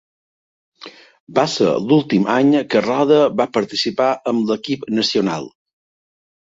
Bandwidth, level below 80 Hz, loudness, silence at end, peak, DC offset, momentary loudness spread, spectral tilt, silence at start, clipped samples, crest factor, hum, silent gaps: 7.8 kHz; -60 dBFS; -17 LUFS; 1.1 s; -2 dBFS; under 0.1%; 8 LU; -5.5 dB/octave; 0.8 s; under 0.1%; 16 dB; none; 1.20-1.27 s